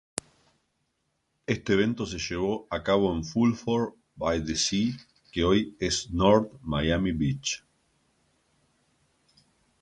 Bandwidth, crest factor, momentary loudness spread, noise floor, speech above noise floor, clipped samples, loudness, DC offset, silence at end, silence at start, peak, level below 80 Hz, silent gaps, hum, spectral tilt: 11.5 kHz; 22 dB; 9 LU; -76 dBFS; 50 dB; under 0.1%; -27 LUFS; under 0.1%; 2.25 s; 1.5 s; -6 dBFS; -46 dBFS; none; none; -5 dB/octave